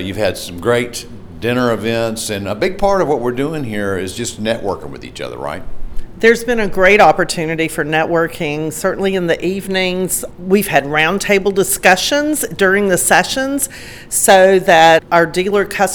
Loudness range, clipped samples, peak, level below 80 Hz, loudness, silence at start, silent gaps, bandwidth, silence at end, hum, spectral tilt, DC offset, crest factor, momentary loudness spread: 7 LU; under 0.1%; 0 dBFS; -36 dBFS; -14 LUFS; 0 s; none; over 20 kHz; 0 s; none; -3.5 dB/octave; under 0.1%; 14 dB; 14 LU